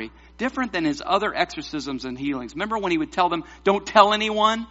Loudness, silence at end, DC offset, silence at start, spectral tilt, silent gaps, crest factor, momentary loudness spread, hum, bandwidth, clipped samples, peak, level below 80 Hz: -23 LUFS; 0.05 s; under 0.1%; 0 s; -2 dB/octave; none; 22 dB; 13 LU; none; 8 kHz; under 0.1%; 0 dBFS; -50 dBFS